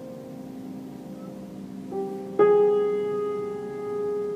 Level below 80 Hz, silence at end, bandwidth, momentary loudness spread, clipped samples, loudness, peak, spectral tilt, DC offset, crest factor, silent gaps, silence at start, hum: -66 dBFS; 0 s; 13.5 kHz; 19 LU; under 0.1%; -25 LUFS; -8 dBFS; -7.5 dB/octave; under 0.1%; 18 dB; none; 0 s; none